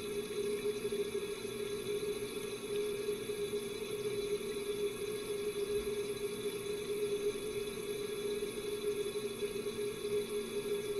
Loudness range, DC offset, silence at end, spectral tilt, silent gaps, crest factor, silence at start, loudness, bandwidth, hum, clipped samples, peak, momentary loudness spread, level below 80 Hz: 1 LU; under 0.1%; 0 s; -3.5 dB/octave; none; 12 dB; 0 s; -38 LUFS; 15 kHz; none; under 0.1%; -26 dBFS; 3 LU; -62 dBFS